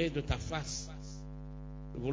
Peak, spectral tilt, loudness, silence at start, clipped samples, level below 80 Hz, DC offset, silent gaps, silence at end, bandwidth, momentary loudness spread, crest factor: -18 dBFS; -5 dB/octave; -40 LUFS; 0 s; under 0.1%; -46 dBFS; under 0.1%; none; 0 s; 8 kHz; 11 LU; 20 dB